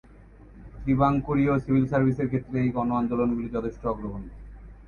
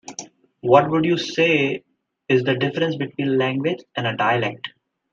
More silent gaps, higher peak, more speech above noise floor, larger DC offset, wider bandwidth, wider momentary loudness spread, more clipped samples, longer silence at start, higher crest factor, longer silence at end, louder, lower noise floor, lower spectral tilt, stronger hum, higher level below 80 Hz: neither; second, -8 dBFS vs -2 dBFS; first, 25 dB vs 20 dB; neither; second, 6.8 kHz vs 7.6 kHz; second, 11 LU vs 15 LU; neither; about the same, 0.2 s vs 0.1 s; about the same, 18 dB vs 20 dB; second, 0.05 s vs 0.45 s; second, -25 LUFS vs -20 LUFS; first, -49 dBFS vs -40 dBFS; first, -10 dB/octave vs -5.5 dB/octave; neither; first, -44 dBFS vs -64 dBFS